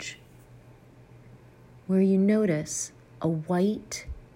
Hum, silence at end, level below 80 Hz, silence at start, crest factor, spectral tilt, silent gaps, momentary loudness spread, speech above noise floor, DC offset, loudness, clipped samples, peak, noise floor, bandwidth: none; 0.15 s; -52 dBFS; 0 s; 16 dB; -6 dB/octave; none; 16 LU; 27 dB; under 0.1%; -27 LUFS; under 0.1%; -14 dBFS; -52 dBFS; 15.5 kHz